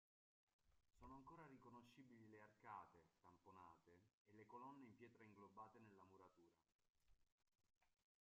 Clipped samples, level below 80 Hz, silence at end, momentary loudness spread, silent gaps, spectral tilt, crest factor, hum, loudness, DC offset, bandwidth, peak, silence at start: under 0.1%; -88 dBFS; 0.3 s; 7 LU; 4.13-4.25 s, 6.75-6.79 s, 7.32-7.38 s, 7.77-7.81 s; -5.5 dB/octave; 22 dB; none; -65 LUFS; under 0.1%; 7 kHz; -46 dBFS; 0.6 s